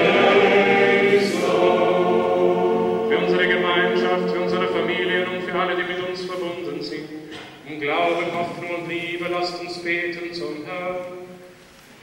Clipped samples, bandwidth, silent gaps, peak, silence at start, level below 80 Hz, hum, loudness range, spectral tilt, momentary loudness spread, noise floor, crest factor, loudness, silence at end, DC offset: under 0.1%; 16 kHz; none; -4 dBFS; 0 s; -62 dBFS; none; 8 LU; -5.5 dB/octave; 14 LU; -47 dBFS; 16 dB; -20 LUFS; 0.5 s; under 0.1%